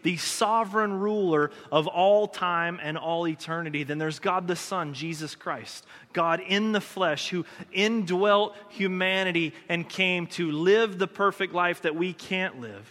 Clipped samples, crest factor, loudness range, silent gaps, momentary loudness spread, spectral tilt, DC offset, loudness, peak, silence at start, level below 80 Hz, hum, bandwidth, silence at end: under 0.1%; 18 dB; 4 LU; none; 10 LU; -4.5 dB/octave; under 0.1%; -26 LUFS; -8 dBFS; 0.05 s; -76 dBFS; none; 16 kHz; 0.05 s